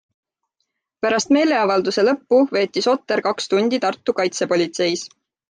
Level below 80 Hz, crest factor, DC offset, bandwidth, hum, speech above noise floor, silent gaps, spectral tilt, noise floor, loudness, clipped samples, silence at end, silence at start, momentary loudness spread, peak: -66 dBFS; 14 dB; under 0.1%; 9.8 kHz; none; 57 dB; none; -4 dB/octave; -75 dBFS; -19 LUFS; under 0.1%; 0.4 s; 1.05 s; 5 LU; -6 dBFS